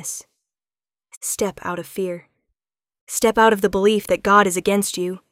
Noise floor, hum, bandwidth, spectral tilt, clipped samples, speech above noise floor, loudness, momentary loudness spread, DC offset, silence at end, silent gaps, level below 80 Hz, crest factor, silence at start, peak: under -90 dBFS; none; 16.5 kHz; -3.5 dB/octave; under 0.1%; over 71 dB; -19 LUFS; 14 LU; under 0.1%; 0.15 s; 1.17-1.21 s, 3.01-3.07 s; -52 dBFS; 18 dB; 0 s; -2 dBFS